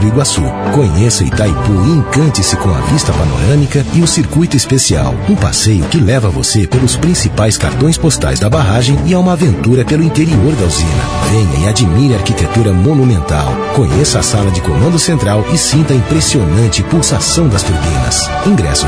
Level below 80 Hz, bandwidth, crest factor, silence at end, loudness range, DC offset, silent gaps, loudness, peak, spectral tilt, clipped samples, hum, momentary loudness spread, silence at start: -22 dBFS; 11 kHz; 10 dB; 0 s; 1 LU; under 0.1%; none; -11 LUFS; 0 dBFS; -5 dB/octave; under 0.1%; none; 3 LU; 0 s